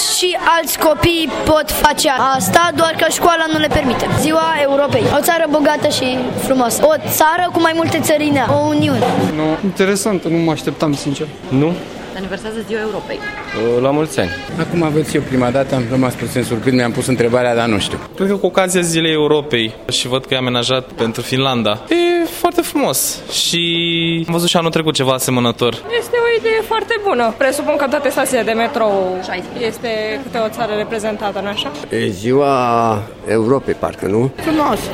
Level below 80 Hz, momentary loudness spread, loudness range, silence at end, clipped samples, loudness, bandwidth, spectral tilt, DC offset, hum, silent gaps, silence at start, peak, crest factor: -40 dBFS; 7 LU; 5 LU; 0 s; under 0.1%; -15 LUFS; 16.5 kHz; -4 dB/octave; under 0.1%; none; none; 0 s; 0 dBFS; 16 dB